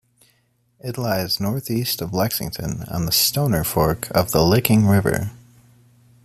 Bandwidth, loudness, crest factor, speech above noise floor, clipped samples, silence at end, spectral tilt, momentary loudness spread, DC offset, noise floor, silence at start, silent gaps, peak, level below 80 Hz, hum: 15 kHz; -20 LUFS; 22 dB; 44 dB; under 0.1%; 0.9 s; -5 dB/octave; 11 LU; under 0.1%; -63 dBFS; 0.85 s; none; 0 dBFS; -44 dBFS; none